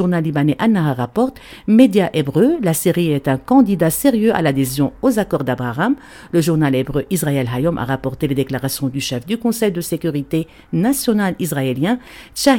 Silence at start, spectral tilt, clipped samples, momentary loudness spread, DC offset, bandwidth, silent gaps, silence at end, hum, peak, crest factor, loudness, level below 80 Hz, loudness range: 0 s; -6 dB/octave; under 0.1%; 7 LU; under 0.1%; 17.5 kHz; none; 0 s; none; 0 dBFS; 16 dB; -17 LUFS; -44 dBFS; 5 LU